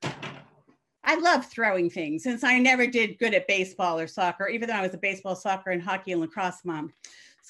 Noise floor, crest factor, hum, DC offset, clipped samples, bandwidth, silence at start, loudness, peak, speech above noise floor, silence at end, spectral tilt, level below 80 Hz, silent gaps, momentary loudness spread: -64 dBFS; 20 dB; none; under 0.1%; under 0.1%; 12 kHz; 0 s; -25 LUFS; -8 dBFS; 37 dB; 0.4 s; -4 dB/octave; -74 dBFS; none; 13 LU